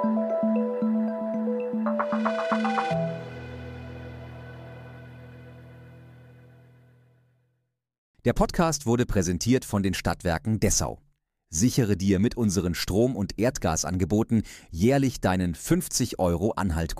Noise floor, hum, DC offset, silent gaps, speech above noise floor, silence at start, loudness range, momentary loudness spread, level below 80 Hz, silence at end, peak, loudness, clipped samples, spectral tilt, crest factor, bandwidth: -76 dBFS; none; under 0.1%; 7.98-8.14 s; 52 dB; 0 s; 16 LU; 18 LU; -42 dBFS; 0 s; -8 dBFS; -26 LUFS; under 0.1%; -5.5 dB/octave; 18 dB; 15.5 kHz